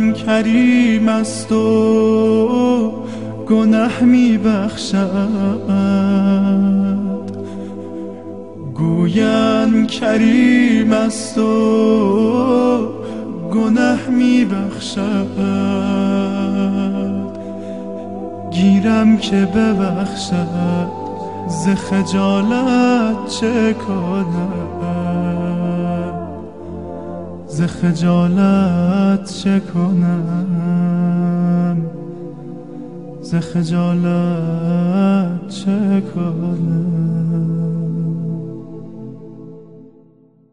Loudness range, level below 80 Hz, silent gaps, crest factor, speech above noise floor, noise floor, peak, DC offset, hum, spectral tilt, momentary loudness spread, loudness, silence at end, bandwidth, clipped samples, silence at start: 6 LU; -52 dBFS; none; 16 dB; 35 dB; -49 dBFS; 0 dBFS; 0.8%; none; -7 dB/octave; 15 LU; -16 LUFS; 0.65 s; 11 kHz; under 0.1%; 0 s